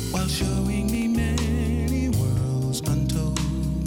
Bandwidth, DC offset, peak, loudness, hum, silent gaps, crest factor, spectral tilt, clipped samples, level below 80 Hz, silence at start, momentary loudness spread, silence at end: 17 kHz; under 0.1%; -10 dBFS; -24 LUFS; none; none; 12 dB; -6 dB/octave; under 0.1%; -30 dBFS; 0 s; 2 LU; 0 s